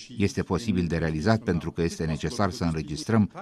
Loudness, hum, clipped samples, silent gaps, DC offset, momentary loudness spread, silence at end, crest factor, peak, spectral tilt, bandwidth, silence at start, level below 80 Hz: -27 LUFS; none; under 0.1%; none; under 0.1%; 5 LU; 0 s; 20 dB; -6 dBFS; -6.5 dB/octave; 13 kHz; 0 s; -44 dBFS